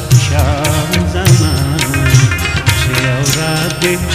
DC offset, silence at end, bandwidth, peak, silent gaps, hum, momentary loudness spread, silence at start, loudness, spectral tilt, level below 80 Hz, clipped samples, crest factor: under 0.1%; 0 s; 16 kHz; 0 dBFS; none; none; 4 LU; 0 s; -12 LUFS; -4.5 dB/octave; -24 dBFS; 0.2%; 12 dB